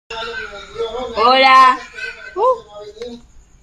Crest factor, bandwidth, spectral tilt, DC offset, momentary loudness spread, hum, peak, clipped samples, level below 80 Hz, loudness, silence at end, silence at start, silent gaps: 16 dB; 11.5 kHz; -2.5 dB/octave; under 0.1%; 23 LU; none; 0 dBFS; under 0.1%; -48 dBFS; -13 LUFS; 0.45 s; 0.1 s; none